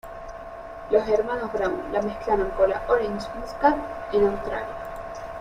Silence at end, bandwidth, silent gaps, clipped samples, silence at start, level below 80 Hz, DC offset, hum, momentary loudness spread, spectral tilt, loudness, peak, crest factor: 0 s; 14.5 kHz; none; under 0.1%; 0.05 s; -44 dBFS; under 0.1%; none; 17 LU; -6 dB/octave; -25 LUFS; -6 dBFS; 20 dB